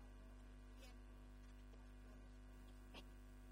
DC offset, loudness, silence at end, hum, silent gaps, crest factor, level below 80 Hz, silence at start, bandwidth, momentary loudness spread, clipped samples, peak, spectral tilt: under 0.1%; -63 LUFS; 0 s; 50 Hz at -60 dBFS; none; 14 dB; -60 dBFS; 0 s; 16 kHz; 2 LU; under 0.1%; -46 dBFS; -5.5 dB/octave